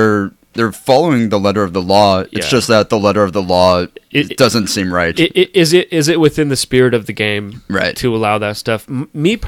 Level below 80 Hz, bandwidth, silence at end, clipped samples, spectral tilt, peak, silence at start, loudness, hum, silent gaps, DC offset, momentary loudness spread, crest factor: -42 dBFS; 17 kHz; 0 s; under 0.1%; -5 dB/octave; 0 dBFS; 0 s; -13 LUFS; none; none; under 0.1%; 7 LU; 14 dB